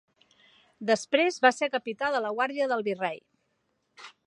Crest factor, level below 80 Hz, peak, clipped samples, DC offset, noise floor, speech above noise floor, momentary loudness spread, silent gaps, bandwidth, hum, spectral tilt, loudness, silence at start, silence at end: 24 dB; -78 dBFS; -6 dBFS; under 0.1%; under 0.1%; -75 dBFS; 48 dB; 10 LU; none; 11 kHz; none; -3.5 dB/octave; -27 LUFS; 0.8 s; 0.2 s